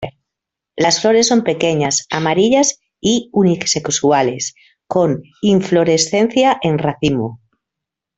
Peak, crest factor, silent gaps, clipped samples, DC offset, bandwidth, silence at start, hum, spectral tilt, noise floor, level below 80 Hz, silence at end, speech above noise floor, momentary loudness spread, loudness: 0 dBFS; 16 dB; none; under 0.1%; under 0.1%; 8.4 kHz; 0 s; none; -4 dB/octave; -83 dBFS; -52 dBFS; 0.8 s; 68 dB; 9 LU; -15 LUFS